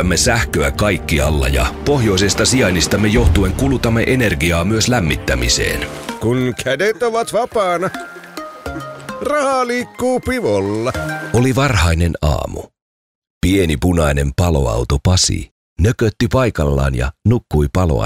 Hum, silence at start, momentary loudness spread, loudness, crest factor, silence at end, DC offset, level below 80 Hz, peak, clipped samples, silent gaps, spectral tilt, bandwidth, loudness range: none; 0 s; 9 LU; -16 LUFS; 14 dB; 0 s; under 0.1%; -26 dBFS; -2 dBFS; under 0.1%; 12.82-13.22 s, 13.30-13.41 s, 15.51-15.76 s; -5 dB/octave; 16 kHz; 5 LU